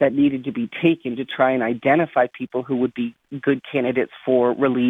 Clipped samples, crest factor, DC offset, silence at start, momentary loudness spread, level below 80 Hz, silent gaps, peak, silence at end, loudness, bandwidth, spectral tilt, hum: under 0.1%; 16 dB; under 0.1%; 0 s; 9 LU; -62 dBFS; none; -4 dBFS; 0 s; -21 LUFS; 3.9 kHz; -8.5 dB/octave; none